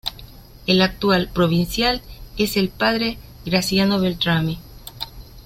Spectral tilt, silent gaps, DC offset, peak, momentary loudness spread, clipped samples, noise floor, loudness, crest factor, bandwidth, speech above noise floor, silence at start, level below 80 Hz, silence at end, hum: -5 dB/octave; none; under 0.1%; -2 dBFS; 15 LU; under 0.1%; -41 dBFS; -20 LUFS; 18 dB; 16.5 kHz; 22 dB; 0.05 s; -40 dBFS; 0.05 s; none